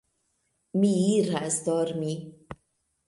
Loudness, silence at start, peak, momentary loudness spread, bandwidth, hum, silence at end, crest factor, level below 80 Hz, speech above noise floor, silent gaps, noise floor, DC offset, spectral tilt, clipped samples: -26 LUFS; 0.75 s; -12 dBFS; 23 LU; 11.5 kHz; none; 0.55 s; 16 dB; -64 dBFS; 49 dB; none; -75 dBFS; under 0.1%; -5.5 dB/octave; under 0.1%